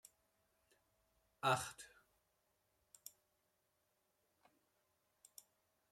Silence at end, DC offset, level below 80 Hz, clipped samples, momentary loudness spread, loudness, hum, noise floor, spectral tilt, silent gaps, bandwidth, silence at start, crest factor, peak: 4.05 s; under 0.1%; -84 dBFS; under 0.1%; 24 LU; -40 LUFS; none; -84 dBFS; -3 dB/octave; none; 16 kHz; 1.45 s; 26 dB; -24 dBFS